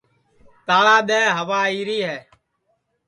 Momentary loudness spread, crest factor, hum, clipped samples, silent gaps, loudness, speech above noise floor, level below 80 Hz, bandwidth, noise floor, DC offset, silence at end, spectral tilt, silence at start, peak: 15 LU; 18 dB; none; under 0.1%; none; -18 LUFS; 51 dB; -68 dBFS; 10.5 kHz; -70 dBFS; under 0.1%; 0.9 s; -3 dB/octave; 0.7 s; -2 dBFS